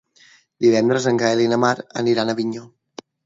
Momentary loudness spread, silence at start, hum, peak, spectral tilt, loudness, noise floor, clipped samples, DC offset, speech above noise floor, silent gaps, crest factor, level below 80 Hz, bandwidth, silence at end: 8 LU; 0.6 s; none; -2 dBFS; -5 dB/octave; -19 LUFS; -53 dBFS; under 0.1%; under 0.1%; 35 dB; none; 18 dB; -66 dBFS; 7.8 kHz; 0.6 s